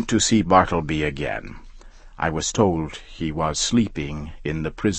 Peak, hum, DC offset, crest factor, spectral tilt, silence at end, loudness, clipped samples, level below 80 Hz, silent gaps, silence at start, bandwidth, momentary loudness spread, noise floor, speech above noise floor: -2 dBFS; none; under 0.1%; 22 dB; -4.5 dB/octave; 0 s; -22 LUFS; under 0.1%; -38 dBFS; none; 0 s; 8.8 kHz; 13 LU; -43 dBFS; 21 dB